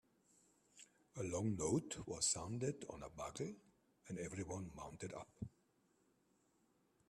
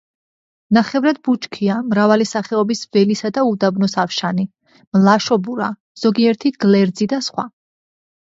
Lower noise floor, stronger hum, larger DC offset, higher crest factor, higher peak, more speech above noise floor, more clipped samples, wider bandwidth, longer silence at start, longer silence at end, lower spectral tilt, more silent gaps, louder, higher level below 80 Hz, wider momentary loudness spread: second, -79 dBFS vs under -90 dBFS; neither; neither; first, 22 dB vs 16 dB; second, -26 dBFS vs 0 dBFS; second, 34 dB vs over 74 dB; neither; first, 13.5 kHz vs 7.8 kHz; about the same, 0.75 s vs 0.7 s; first, 1.6 s vs 0.8 s; second, -4.5 dB/octave vs -6 dB/octave; second, none vs 4.87-4.92 s, 5.80-5.95 s; second, -45 LUFS vs -17 LUFS; second, -70 dBFS vs -64 dBFS; first, 17 LU vs 9 LU